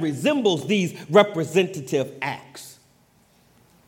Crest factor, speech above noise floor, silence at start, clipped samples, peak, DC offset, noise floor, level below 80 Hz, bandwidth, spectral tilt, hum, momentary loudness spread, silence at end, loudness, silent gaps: 22 dB; 37 dB; 0 s; under 0.1%; -2 dBFS; under 0.1%; -59 dBFS; -70 dBFS; 17 kHz; -5 dB/octave; none; 20 LU; 1.15 s; -22 LUFS; none